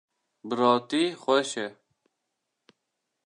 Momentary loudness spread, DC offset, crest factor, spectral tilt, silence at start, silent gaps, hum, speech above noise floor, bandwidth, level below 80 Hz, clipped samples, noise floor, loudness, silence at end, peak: 13 LU; under 0.1%; 22 dB; -4 dB/octave; 0.45 s; none; none; 56 dB; 11 kHz; -84 dBFS; under 0.1%; -82 dBFS; -26 LUFS; 1.55 s; -6 dBFS